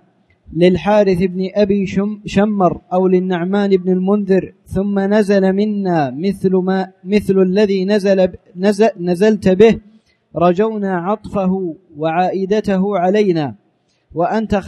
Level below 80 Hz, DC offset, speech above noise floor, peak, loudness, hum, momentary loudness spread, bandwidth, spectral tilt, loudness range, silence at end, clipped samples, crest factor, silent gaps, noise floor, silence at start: -44 dBFS; under 0.1%; 46 dB; 0 dBFS; -15 LUFS; none; 7 LU; 11.5 kHz; -7.5 dB/octave; 3 LU; 0 s; under 0.1%; 14 dB; none; -60 dBFS; 0.5 s